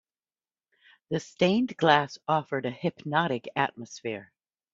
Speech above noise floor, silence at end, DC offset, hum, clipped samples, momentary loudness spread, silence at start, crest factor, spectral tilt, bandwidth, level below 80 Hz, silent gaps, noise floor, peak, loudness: over 63 dB; 0.5 s; under 0.1%; none; under 0.1%; 13 LU; 1.1 s; 24 dB; -5.5 dB/octave; 7.8 kHz; -70 dBFS; none; under -90 dBFS; -6 dBFS; -28 LUFS